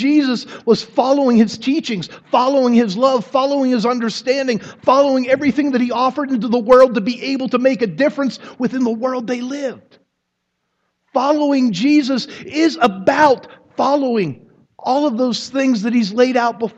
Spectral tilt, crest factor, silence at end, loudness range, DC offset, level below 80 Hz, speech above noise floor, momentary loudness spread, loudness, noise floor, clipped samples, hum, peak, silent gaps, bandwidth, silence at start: -5.5 dB/octave; 16 dB; 0.1 s; 5 LU; under 0.1%; -60 dBFS; 57 dB; 9 LU; -16 LUFS; -73 dBFS; under 0.1%; none; 0 dBFS; none; 8.2 kHz; 0 s